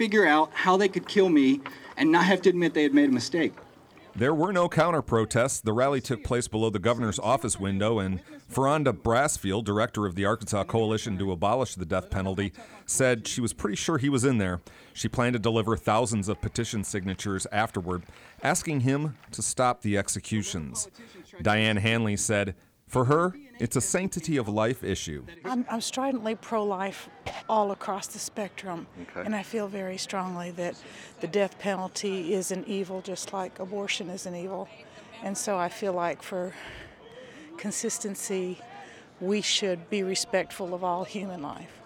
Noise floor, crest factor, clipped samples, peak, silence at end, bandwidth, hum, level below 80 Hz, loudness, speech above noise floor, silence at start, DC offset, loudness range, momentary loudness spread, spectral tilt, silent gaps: -52 dBFS; 20 dB; under 0.1%; -8 dBFS; 0 s; 19 kHz; none; -54 dBFS; -27 LUFS; 25 dB; 0 s; under 0.1%; 8 LU; 13 LU; -4.5 dB/octave; none